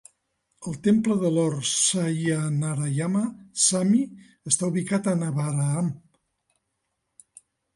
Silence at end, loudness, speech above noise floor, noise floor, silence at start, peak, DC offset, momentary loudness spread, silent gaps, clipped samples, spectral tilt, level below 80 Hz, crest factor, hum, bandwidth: 1.8 s; -24 LUFS; 54 dB; -78 dBFS; 0.6 s; -6 dBFS; under 0.1%; 9 LU; none; under 0.1%; -4.5 dB/octave; -66 dBFS; 20 dB; none; 11.5 kHz